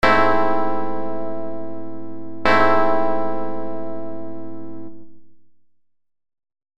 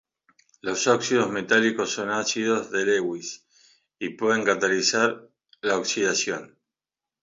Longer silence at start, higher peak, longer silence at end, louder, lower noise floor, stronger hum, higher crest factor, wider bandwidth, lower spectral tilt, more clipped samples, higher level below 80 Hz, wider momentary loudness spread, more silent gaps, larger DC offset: second, 0 s vs 0.65 s; first, 0 dBFS vs -6 dBFS; second, 0.15 s vs 0.75 s; first, -21 LUFS vs -24 LUFS; second, -61 dBFS vs under -90 dBFS; neither; about the same, 22 dB vs 20 dB; first, 11.5 kHz vs 7.8 kHz; first, -6 dB/octave vs -2.5 dB/octave; neither; first, -48 dBFS vs -70 dBFS; first, 19 LU vs 13 LU; neither; first, 8% vs under 0.1%